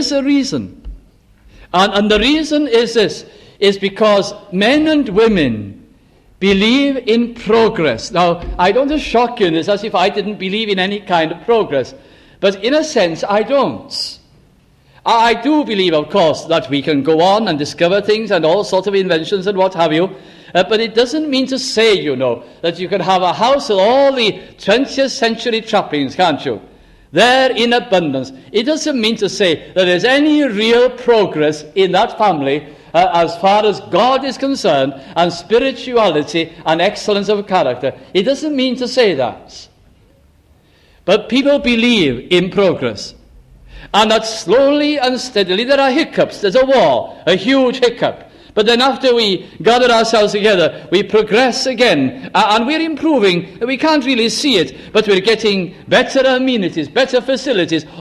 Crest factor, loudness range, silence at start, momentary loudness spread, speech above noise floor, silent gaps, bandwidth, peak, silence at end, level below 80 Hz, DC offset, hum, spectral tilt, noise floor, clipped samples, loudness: 14 dB; 3 LU; 0 s; 7 LU; 36 dB; none; 12.5 kHz; 0 dBFS; 0 s; -44 dBFS; under 0.1%; none; -4.5 dB/octave; -50 dBFS; under 0.1%; -14 LUFS